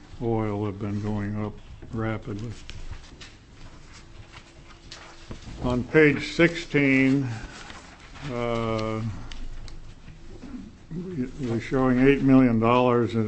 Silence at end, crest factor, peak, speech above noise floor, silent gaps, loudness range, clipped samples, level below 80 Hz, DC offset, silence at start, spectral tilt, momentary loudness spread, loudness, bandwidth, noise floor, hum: 0 s; 22 dB; -4 dBFS; 24 dB; none; 14 LU; under 0.1%; -42 dBFS; under 0.1%; 0 s; -7 dB/octave; 24 LU; -24 LUFS; 8.6 kHz; -47 dBFS; none